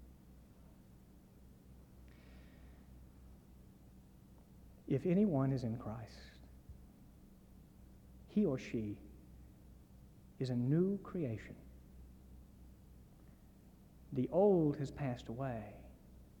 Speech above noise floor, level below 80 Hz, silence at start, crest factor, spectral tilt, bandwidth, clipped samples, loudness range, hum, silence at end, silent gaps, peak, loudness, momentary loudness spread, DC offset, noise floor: 25 dB; -62 dBFS; 0 s; 22 dB; -9 dB/octave; 19 kHz; under 0.1%; 22 LU; none; 0.15 s; none; -20 dBFS; -37 LUFS; 28 LU; under 0.1%; -61 dBFS